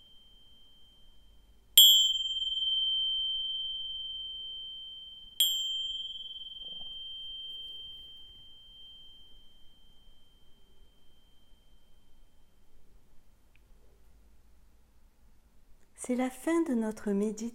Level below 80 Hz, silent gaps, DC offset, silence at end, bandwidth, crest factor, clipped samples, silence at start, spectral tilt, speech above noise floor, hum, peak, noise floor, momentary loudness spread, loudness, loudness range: -62 dBFS; none; under 0.1%; 0 s; 16.5 kHz; 30 dB; under 0.1%; 0.15 s; -1.5 dB/octave; 28 dB; none; -4 dBFS; -59 dBFS; 23 LU; -27 LUFS; 20 LU